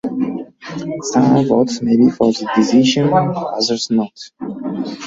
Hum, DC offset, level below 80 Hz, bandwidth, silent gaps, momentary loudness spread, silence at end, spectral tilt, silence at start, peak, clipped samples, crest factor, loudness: none; under 0.1%; -54 dBFS; 7.8 kHz; none; 15 LU; 0 s; -5.5 dB/octave; 0.05 s; -2 dBFS; under 0.1%; 14 dB; -16 LUFS